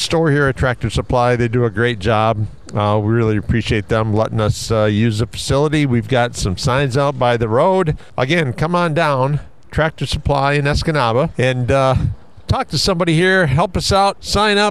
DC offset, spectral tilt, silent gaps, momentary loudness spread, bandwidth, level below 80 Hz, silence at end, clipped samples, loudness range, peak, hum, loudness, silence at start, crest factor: 1%; -5.5 dB/octave; none; 6 LU; 13.5 kHz; -32 dBFS; 0 s; under 0.1%; 1 LU; -2 dBFS; none; -16 LUFS; 0 s; 14 dB